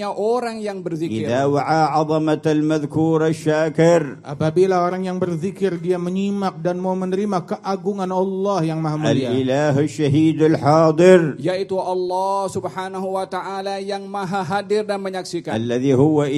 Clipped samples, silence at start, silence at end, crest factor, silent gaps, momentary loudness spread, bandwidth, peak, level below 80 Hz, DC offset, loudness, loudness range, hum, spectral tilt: under 0.1%; 0 s; 0 s; 18 dB; none; 10 LU; 12.5 kHz; 0 dBFS; -58 dBFS; under 0.1%; -19 LUFS; 7 LU; none; -7 dB/octave